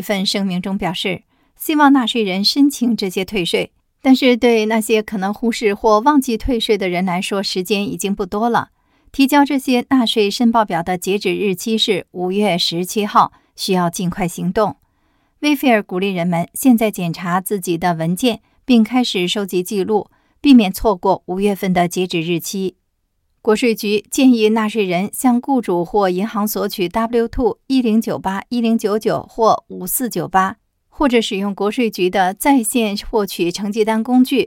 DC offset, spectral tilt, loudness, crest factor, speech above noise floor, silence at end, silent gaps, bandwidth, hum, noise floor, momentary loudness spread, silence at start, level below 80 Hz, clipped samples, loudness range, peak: under 0.1%; -4.5 dB/octave; -17 LUFS; 16 dB; 51 dB; 0 s; none; 17 kHz; none; -67 dBFS; 7 LU; 0 s; -42 dBFS; under 0.1%; 3 LU; 0 dBFS